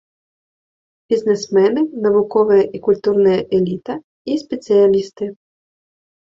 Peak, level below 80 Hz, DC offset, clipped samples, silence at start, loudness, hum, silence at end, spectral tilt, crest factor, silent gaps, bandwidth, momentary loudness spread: -2 dBFS; -58 dBFS; under 0.1%; under 0.1%; 1.1 s; -16 LUFS; none; 0.95 s; -6.5 dB/octave; 14 dB; 4.04-4.25 s; 7.6 kHz; 13 LU